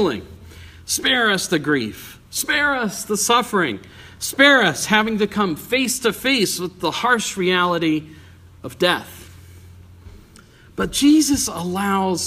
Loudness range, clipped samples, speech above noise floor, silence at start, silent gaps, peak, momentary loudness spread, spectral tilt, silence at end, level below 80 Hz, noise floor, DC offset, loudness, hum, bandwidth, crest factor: 5 LU; under 0.1%; 27 dB; 0 s; none; 0 dBFS; 13 LU; -3 dB/octave; 0 s; -50 dBFS; -47 dBFS; under 0.1%; -18 LUFS; none; 15.5 kHz; 20 dB